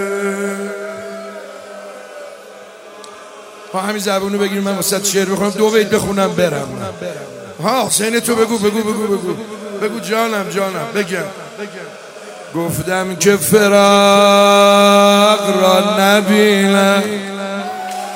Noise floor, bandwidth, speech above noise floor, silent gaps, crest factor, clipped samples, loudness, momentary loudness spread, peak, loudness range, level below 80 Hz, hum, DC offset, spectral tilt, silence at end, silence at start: -36 dBFS; 16.5 kHz; 23 dB; none; 14 dB; 0.2%; -14 LUFS; 23 LU; 0 dBFS; 13 LU; -54 dBFS; none; under 0.1%; -4 dB/octave; 0 s; 0 s